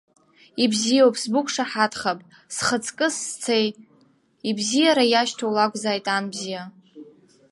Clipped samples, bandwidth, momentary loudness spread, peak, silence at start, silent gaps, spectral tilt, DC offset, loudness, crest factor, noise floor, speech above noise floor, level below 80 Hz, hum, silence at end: under 0.1%; 11.5 kHz; 14 LU; -4 dBFS; 0.55 s; none; -3 dB/octave; under 0.1%; -22 LUFS; 20 dB; -60 dBFS; 38 dB; -68 dBFS; none; 0.4 s